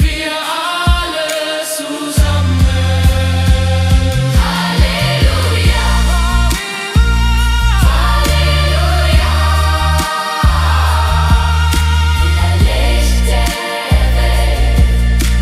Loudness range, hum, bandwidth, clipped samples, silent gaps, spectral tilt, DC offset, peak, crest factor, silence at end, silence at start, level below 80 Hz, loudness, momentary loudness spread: 1 LU; none; 15.5 kHz; under 0.1%; none; -4.5 dB/octave; under 0.1%; 0 dBFS; 12 dB; 0 s; 0 s; -14 dBFS; -13 LUFS; 4 LU